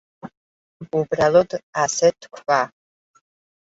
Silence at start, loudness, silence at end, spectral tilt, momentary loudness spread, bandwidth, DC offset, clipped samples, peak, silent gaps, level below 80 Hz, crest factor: 0.25 s; -20 LUFS; 0.95 s; -4 dB/octave; 22 LU; 8 kHz; under 0.1%; under 0.1%; -4 dBFS; 0.37-0.80 s, 1.63-1.73 s; -60 dBFS; 18 dB